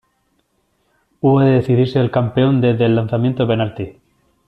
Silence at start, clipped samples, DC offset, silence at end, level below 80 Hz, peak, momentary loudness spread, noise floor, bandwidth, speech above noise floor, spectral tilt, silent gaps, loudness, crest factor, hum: 1.25 s; under 0.1%; under 0.1%; 0.55 s; -50 dBFS; -2 dBFS; 6 LU; -64 dBFS; 5 kHz; 50 dB; -10 dB/octave; none; -16 LUFS; 14 dB; none